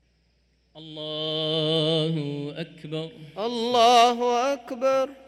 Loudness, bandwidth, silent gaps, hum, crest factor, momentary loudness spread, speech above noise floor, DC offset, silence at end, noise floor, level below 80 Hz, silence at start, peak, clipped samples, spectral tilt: -23 LUFS; 14 kHz; none; none; 18 dB; 17 LU; 43 dB; under 0.1%; 0.15 s; -66 dBFS; -68 dBFS; 0.75 s; -8 dBFS; under 0.1%; -4.5 dB/octave